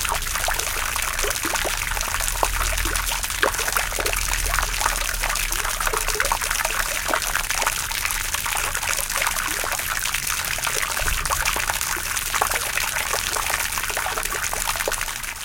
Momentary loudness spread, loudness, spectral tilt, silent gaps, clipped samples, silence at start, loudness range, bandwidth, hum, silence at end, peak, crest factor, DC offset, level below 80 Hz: 2 LU; -22 LUFS; -0.5 dB/octave; none; under 0.1%; 0 s; 1 LU; 17.5 kHz; none; 0 s; -2 dBFS; 22 dB; under 0.1%; -32 dBFS